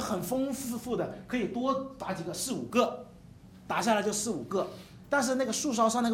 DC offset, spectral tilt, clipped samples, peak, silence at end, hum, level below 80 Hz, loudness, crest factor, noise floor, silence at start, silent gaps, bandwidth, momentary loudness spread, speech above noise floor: under 0.1%; -4 dB/octave; under 0.1%; -12 dBFS; 0 s; none; -62 dBFS; -31 LUFS; 18 dB; -52 dBFS; 0 s; none; 16.5 kHz; 9 LU; 21 dB